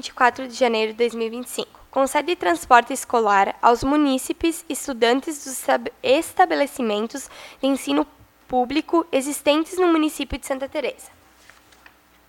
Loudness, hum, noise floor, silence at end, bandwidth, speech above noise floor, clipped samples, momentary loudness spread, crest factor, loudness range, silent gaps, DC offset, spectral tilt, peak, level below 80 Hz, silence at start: -21 LUFS; none; -52 dBFS; 1.2 s; 19 kHz; 31 dB; under 0.1%; 11 LU; 22 dB; 3 LU; none; under 0.1%; -3 dB/octave; 0 dBFS; -50 dBFS; 0.05 s